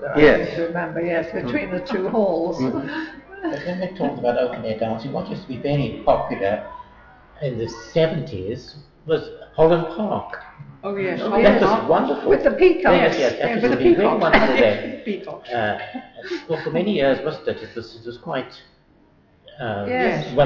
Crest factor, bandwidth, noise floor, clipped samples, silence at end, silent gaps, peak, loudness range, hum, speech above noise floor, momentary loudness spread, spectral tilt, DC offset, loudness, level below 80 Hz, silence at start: 18 dB; 6 kHz; -55 dBFS; under 0.1%; 0 s; none; -2 dBFS; 9 LU; none; 35 dB; 16 LU; -7 dB/octave; under 0.1%; -21 LUFS; -44 dBFS; 0 s